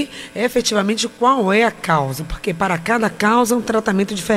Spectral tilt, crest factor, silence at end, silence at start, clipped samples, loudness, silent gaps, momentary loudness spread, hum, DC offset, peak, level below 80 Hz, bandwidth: -4.5 dB/octave; 14 dB; 0 s; 0 s; under 0.1%; -18 LUFS; none; 8 LU; none; under 0.1%; -2 dBFS; -42 dBFS; 16 kHz